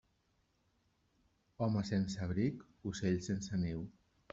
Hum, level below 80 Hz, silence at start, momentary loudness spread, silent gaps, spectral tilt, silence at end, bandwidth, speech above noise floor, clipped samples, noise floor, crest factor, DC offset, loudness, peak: none; -64 dBFS; 1.6 s; 9 LU; none; -6.5 dB/octave; 0.4 s; 7.8 kHz; 41 dB; under 0.1%; -77 dBFS; 18 dB; under 0.1%; -38 LUFS; -22 dBFS